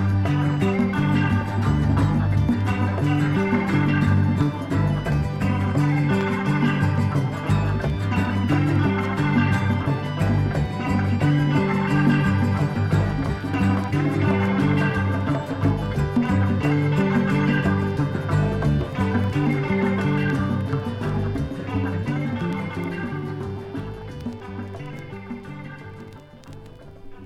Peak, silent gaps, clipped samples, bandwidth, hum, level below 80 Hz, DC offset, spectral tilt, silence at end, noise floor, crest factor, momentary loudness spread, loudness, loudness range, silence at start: -8 dBFS; none; under 0.1%; 11.5 kHz; none; -38 dBFS; under 0.1%; -8 dB/octave; 0 s; -41 dBFS; 14 dB; 13 LU; -22 LUFS; 8 LU; 0 s